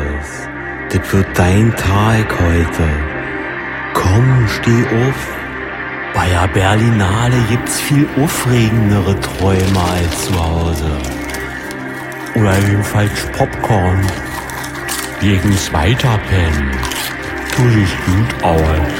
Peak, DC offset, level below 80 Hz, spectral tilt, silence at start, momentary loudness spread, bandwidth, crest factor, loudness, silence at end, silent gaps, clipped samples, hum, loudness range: 0 dBFS; under 0.1%; -28 dBFS; -5.5 dB/octave; 0 s; 10 LU; 16.5 kHz; 14 dB; -15 LUFS; 0 s; none; under 0.1%; none; 3 LU